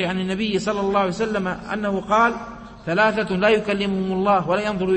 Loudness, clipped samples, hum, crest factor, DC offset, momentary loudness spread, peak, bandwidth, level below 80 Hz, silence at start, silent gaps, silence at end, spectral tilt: -21 LUFS; under 0.1%; none; 16 dB; under 0.1%; 7 LU; -6 dBFS; 8.8 kHz; -48 dBFS; 0 s; none; 0 s; -6 dB/octave